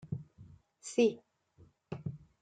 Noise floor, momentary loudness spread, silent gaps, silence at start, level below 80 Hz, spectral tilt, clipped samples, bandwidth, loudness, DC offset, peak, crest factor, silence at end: -65 dBFS; 21 LU; none; 0.05 s; -70 dBFS; -6 dB/octave; under 0.1%; 9.4 kHz; -35 LUFS; under 0.1%; -16 dBFS; 20 dB; 0.25 s